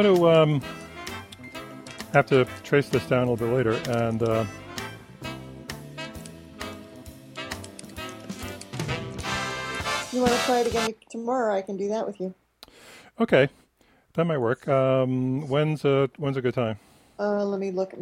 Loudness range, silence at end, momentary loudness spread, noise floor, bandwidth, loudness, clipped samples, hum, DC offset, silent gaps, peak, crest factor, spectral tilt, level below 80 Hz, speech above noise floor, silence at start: 12 LU; 0 s; 17 LU; -62 dBFS; 16.5 kHz; -25 LUFS; under 0.1%; none; under 0.1%; none; -4 dBFS; 22 dB; -5.5 dB/octave; -54 dBFS; 39 dB; 0 s